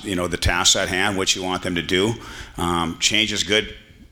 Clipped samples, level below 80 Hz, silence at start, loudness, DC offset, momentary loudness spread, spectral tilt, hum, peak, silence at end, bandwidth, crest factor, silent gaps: under 0.1%; -38 dBFS; 0 s; -19 LUFS; under 0.1%; 9 LU; -2.5 dB/octave; none; -4 dBFS; 0.35 s; 18 kHz; 18 dB; none